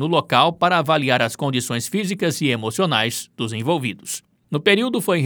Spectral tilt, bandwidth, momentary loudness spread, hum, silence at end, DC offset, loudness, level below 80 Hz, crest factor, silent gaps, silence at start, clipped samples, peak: -4.5 dB/octave; over 20 kHz; 10 LU; none; 0 s; under 0.1%; -20 LUFS; -68 dBFS; 20 dB; none; 0 s; under 0.1%; 0 dBFS